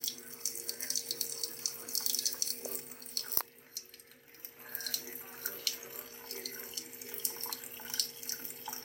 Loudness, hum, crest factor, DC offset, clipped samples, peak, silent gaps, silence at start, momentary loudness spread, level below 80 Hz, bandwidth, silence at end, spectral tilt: -36 LUFS; none; 36 dB; under 0.1%; under 0.1%; -4 dBFS; none; 0 s; 12 LU; -80 dBFS; 17 kHz; 0 s; 1 dB/octave